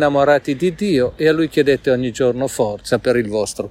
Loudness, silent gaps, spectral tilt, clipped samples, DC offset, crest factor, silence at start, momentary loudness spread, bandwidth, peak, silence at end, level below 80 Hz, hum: -17 LUFS; none; -5.5 dB/octave; under 0.1%; under 0.1%; 14 dB; 0 s; 5 LU; 16 kHz; -2 dBFS; 0 s; -46 dBFS; none